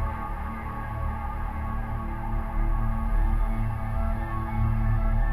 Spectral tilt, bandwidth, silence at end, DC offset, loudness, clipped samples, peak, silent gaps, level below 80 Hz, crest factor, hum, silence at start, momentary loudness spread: -9 dB/octave; 3.6 kHz; 0 s; under 0.1%; -30 LUFS; under 0.1%; -14 dBFS; none; -28 dBFS; 12 dB; none; 0 s; 7 LU